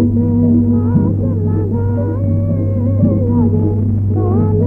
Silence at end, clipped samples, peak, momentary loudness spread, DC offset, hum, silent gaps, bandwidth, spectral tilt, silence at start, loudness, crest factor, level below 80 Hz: 0 s; under 0.1%; -2 dBFS; 4 LU; under 0.1%; none; none; 1.8 kHz; -13.5 dB/octave; 0 s; -14 LUFS; 12 dB; -30 dBFS